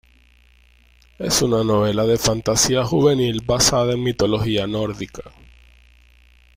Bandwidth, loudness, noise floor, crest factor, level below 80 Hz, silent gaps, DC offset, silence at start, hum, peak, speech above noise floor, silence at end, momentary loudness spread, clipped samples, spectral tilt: 16 kHz; -18 LUFS; -53 dBFS; 18 dB; -42 dBFS; none; under 0.1%; 1.2 s; 60 Hz at -40 dBFS; -2 dBFS; 34 dB; 1.25 s; 10 LU; under 0.1%; -4 dB/octave